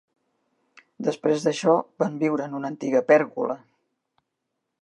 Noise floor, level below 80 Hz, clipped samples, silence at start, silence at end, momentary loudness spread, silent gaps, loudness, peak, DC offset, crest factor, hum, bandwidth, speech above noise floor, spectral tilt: -80 dBFS; -80 dBFS; under 0.1%; 1 s; 1.25 s; 11 LU; none; -24 LUFS; -4 dBFS; under 0.1%; 20 dB; none; 11 kHz; 57 dB; -6 dB/octave